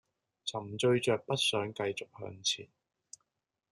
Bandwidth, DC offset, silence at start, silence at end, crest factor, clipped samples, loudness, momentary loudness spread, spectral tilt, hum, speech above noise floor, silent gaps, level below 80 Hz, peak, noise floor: 12.5 kHz; under 0.1%; 0.45 s; 1.05 s; 18 dB; under 0.1%; -33 LUFS; 12 LU; -3.5 dB/octave; none; 53 dB; none; -78 dBFS; -16 dBFS; -86 dBFS